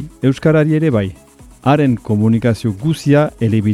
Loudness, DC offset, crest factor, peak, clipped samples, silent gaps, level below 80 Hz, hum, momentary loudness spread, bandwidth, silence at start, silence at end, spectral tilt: -15 LUFS; under 0.1%; 14 dB; 0 dBFS; under 0.1%; none; -44 dBFS; none; 5 LU; 12.5 kHz; 0 s; 0 s; -8 dB/octave